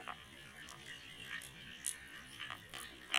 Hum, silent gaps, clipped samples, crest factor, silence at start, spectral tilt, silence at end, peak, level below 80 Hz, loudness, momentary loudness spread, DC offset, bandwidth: none; none; under 0.1%; 32 dB; 0 s; -0.5 dB/octave; 0 s; -14 dBFS; -70 dBFS; -47 LUFS; 9 LU; under 0.1%; 16.5 kHz